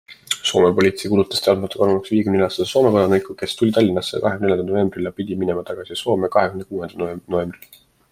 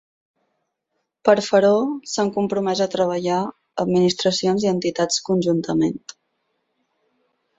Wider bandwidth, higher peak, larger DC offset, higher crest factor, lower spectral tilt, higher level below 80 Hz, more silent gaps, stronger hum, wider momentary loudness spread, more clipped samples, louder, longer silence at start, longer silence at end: first, 16 kHz vs 8.2 kHz; about the same, -2 dBFS vs -2 dBFS; neither; about the same, 18 dB vs 20 dB; about the same, -5.5 dB/octave vs -5 dB/octave; first, -56 dBFS vs -62 dBFS; neither; neither; first, 11 LU vs 8 LU; neither; about the same, -19 LUFS vs -20 LUFS; second, 0.1 s vs 1.25 s; second, 0.6 s vs 1.6 s